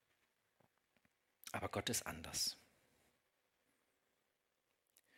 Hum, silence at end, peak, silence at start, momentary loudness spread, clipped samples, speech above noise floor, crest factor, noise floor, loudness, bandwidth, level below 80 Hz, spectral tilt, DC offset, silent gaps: none; 2.55 s; -26 dBFS; 1.45 s; 14 LU; under 0.1%; 42 dB; 24 dB; -86 dBFS; -42 LUFS; 17.5 kHz; -76 dBFS; -2 dB/octave; under 0.1%; none